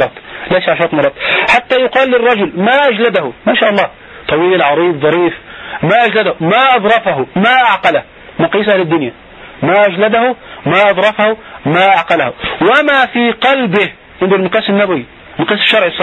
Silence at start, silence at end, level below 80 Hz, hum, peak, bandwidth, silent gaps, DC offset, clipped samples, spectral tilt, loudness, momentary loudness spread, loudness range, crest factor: 0 s; 0 s; -46 dBFS; none; 0 dBFS; 10 kHz; none; under 0.1%; under 0.1%; -6.5 dB/octave; -11 LUFS; 9 LU; 1 LU; 12 dB